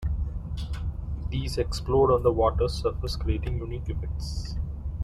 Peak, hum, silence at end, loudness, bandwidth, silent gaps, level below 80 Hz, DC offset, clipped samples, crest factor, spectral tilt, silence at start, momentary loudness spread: -10 dBFS; none; 0 s; -28 LUFS; 13 kHz; none; -32 dBFS; under 0.1%; under 0.1%; 18 dB; -7 dB/octave; 0 s; 12 LU